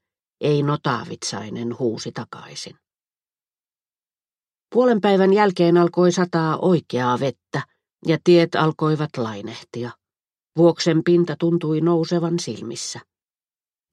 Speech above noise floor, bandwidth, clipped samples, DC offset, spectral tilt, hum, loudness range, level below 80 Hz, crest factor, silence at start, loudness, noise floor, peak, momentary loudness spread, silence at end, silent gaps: over 70 dB; 10.5 kHz; under 0.1%; under 0.1%; -6 dB/octave; none; 10 LU; -68 dBFS; 18 dB; 0.4 s; -20 LUFS; under -90 dBFS; -2 dBFS; 16 LU; 0.9 s; none